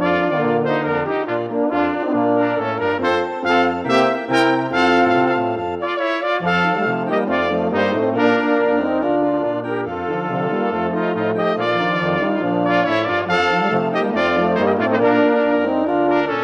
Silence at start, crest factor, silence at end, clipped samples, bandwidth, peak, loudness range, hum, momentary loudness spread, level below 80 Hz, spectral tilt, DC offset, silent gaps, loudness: 0 s; 16 dB; 0 s; under 0.1%; 10 kHz; -2 dBFS; 3 LU; none; 5 LU; -56 dBFS; -6.5 dB/octave; under 0.1%; none; -18 LUFS